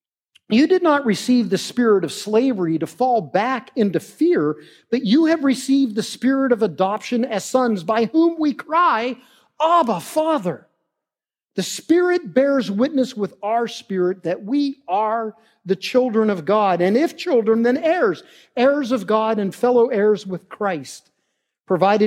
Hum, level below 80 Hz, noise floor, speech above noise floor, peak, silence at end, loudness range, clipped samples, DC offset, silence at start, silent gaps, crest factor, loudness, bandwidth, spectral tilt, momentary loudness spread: none; -76 dBFS; -89 dBFS; 70 dB; -2 dBFS; 0 s; 3 LU; under 0.1%; under 0.1%; 0.5 s; none; 16 dB; -19 LUFS; 16 kHz; -5.5 dB/octave; 9 LU